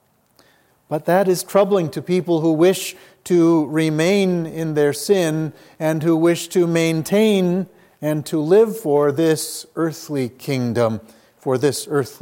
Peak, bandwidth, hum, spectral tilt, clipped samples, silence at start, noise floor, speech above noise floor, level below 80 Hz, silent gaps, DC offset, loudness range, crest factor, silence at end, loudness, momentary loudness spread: -2 dBFS; 17 kHz; none; -6 dB/octave; under 0.1%; 0.9 s; -57 dBFS; 39 dB; -66 dBFS; none; under 0.1%; 2 LU; 16 dB; 0.05 s; -19 LUFS; 10 LU